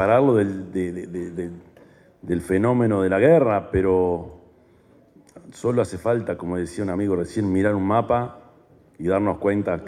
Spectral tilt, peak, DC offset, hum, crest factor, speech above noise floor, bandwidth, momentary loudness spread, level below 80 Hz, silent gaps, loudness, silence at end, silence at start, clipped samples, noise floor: -8 dB/octave; -4 dBFS; under 0.1%; none; 18 dB; 33 dB; 12.5 kHz; 13 LU; -48 dBFS; none; -22 LUFS; 0 s; 0 s; under 0.1%; -54 dBFS